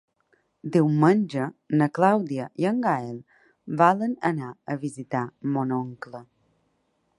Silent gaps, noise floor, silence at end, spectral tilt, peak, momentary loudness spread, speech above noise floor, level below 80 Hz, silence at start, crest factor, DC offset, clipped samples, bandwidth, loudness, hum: none; -71 dBFS; 0.95 s; -8 dB/octave; -4 dBFS; 16 LU; 47 dB; -72 dBFS; 0.65 s; 20 dB; under 0.1%; under 0.1%; 11.5 kHz; -24 LUFS; none